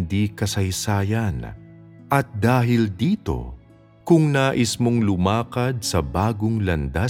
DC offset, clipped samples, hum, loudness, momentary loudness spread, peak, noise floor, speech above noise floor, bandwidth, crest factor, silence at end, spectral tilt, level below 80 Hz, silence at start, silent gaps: under 0.1%; under 0.1%; none; -21 LUFS; 9 LU; -2 dBFS; -50 dBFS; 29 dB; 16.5 kHz; 18 dB; 0 s; -6 dB/octave; -40 dBFS; 0 s; none